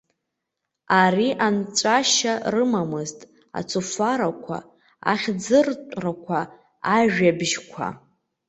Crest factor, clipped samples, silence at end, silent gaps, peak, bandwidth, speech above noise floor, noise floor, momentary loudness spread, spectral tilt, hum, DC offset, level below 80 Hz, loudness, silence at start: 20 dB; under 0.1%; 0.5 s; none; -4 dBFS; 8.4 kHz; 60 dB; -81 dBFS; 14 LU; -3.5 dB/octave; none; under 0.1%; -64 dBFS; -22 LUFS; 0.9 s